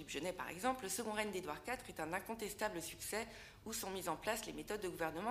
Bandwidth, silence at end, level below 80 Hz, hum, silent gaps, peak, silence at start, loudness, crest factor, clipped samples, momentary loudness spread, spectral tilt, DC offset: 15.5 kHz; 0 s; -66 dBFS; none; none; -22 dBFS; 0 s; -43 LUFS; 22 dB; under 0.1%; 5 LU; -3 dB/octave; under 0.1%